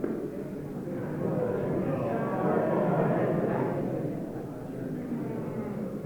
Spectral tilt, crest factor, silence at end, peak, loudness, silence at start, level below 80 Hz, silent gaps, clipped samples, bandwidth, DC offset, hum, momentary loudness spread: -9.5 dB/octave; 18 dB; 0 s; -12 dBFS; -31 LUFS; 0 s; -58 dBFS; none; under 0.1%; 19.5 kHz; under 0.1%; none; 10 LU